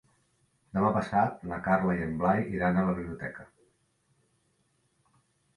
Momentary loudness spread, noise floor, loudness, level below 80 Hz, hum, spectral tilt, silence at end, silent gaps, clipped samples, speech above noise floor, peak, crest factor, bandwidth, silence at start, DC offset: 11 LU; -72 dBFS; -29 LUFS; -54 dBFS; none; -9 dB/octave; 2.1 s; none; under 0.1%; 44 dB; -12 dBFS; 18 dB; 11 kHz; 0.75 s; under 0.1%